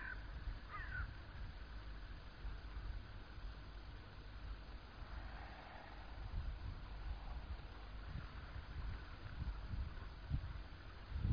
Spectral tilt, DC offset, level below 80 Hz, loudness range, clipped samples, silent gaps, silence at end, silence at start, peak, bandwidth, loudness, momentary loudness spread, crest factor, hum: -5 dB/octave; under 0.1%; -50 dBFS; 4 LU; under 0.1%; none; 0 s; 0 s; -28 dBFS; 5.2 kHz; -52 LUFS; 8 LU; 20 dB; none